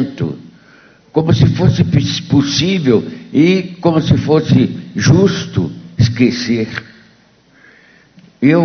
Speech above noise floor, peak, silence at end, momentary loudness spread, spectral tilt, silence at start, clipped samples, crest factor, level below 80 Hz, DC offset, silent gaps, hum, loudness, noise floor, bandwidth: 37 dB; 0 dBFS; 0 s; 9 LU; -6.5 dB/octave; 0 s; under 0.1%; 14 dB; -38 dBFS; under 0.1%; none; none; -14 LUFS; -49 dBFS; 6.6 kHz